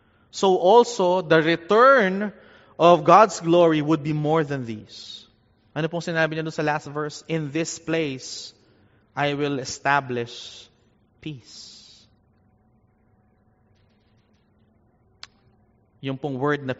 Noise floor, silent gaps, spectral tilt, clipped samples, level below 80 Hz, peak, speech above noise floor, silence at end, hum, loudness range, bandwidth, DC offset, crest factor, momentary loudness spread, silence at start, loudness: -61 dBFS; none; -4 dB/octave; under 0.1%; -66 dBFS; 0 dBFS; 40 dB; 0.05 s; none; 15 LU; 8 kHz; under 0.1%; 22 dB; 23 LU; 0.35 s; -21 LUFS